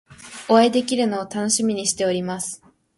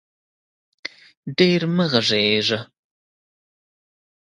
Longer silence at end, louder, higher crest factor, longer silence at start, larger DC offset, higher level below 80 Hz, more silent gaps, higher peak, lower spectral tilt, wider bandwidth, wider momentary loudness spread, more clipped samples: second, 0.4 s vs 1.65 s; about the same, -20 LUFS vs -19 LUFS; about the same, 18 dB vs 22 dB; second, 0.1 s vs 0.85 s; neither; about the same, -64 dBFS vs -64 dBFS; second, none vs 1.17-1.23 s; about the same, -4 dBFS vs -2 dBFS; second, -3.5 dB/octave vs -5 dB/octave; about the same, 11.5 kHz vs 10.5 kHz; about the same, 17 LU vs 18 LU; neither